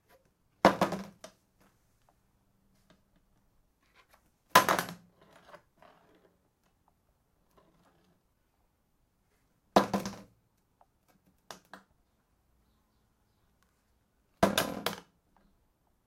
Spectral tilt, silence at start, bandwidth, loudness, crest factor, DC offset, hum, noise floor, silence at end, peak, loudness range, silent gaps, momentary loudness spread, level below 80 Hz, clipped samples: -4 dB/octave; 0.65 s; 16 kHz; -29 LUFS; 32 dB; under 0.1%; none; -74 dBFS; 1.05 s; -4 dBFS; 6 LU; none; 26 LU; -64 dBFS; under 0.1%